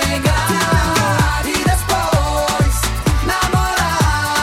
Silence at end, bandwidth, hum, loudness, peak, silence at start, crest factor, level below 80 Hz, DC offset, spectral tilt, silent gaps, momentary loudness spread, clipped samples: 0 s; 16.5 kHz; none; -16 LUFS; -4 dBFS; 0 s; 12 dB; -22 dBFS; under 0.1%; -4 dB/octave; none; 2 LU; under 0.1%